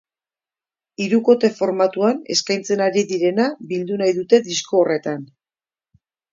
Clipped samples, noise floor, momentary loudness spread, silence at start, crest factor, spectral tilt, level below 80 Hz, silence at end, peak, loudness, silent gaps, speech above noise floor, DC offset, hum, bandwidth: under 0.1%; under -90 dBFS; 8 LU; 1 s; 20 dB; -4.5 dB/octave; -70 dBFS; 1.1 s; 0 dBFS; -19 LUFS; none; over 72 dB; under 0.1%; none; 7.6 kHz